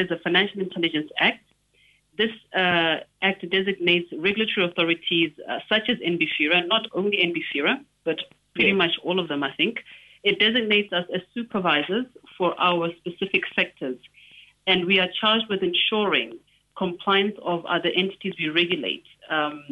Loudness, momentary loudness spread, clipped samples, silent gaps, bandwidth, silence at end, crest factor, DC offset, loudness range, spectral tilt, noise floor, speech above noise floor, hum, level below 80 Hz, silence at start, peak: -23 LUFS; 10 LU; under 0.1%; none; 7.6 kHz; 0 s; 18 dB; under 0.1%; 2 LU; -6.5 dB/octave; -62 dBFS; 38 dB; none; -66 dBFS; 0 s; -6 dBFS